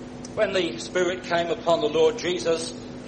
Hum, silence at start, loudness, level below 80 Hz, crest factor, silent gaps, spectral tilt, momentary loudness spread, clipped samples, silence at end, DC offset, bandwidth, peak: none; 0 s; -25 LUFS; -54 dBFS; 18 dB; none; -4 dB/octave; 6 LU; under 0.1%; 0 s; under 0.1%; 9.8 kHz; -8 dBFS